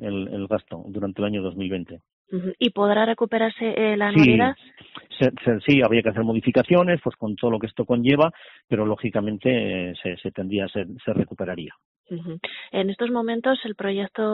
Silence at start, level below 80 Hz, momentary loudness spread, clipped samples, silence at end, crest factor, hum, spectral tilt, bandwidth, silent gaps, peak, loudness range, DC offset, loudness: 0 s; -56 dBFS; 14 LU; under 0.1%; 0 s; 20 dB; none; -5 dB/octave; 4.5 kHz; 2.13-2.25 s, 8.64-8.68 s, 11.85-12.04 s; -4 dBFS; 7 LU; under 0.1%; -23 LUFS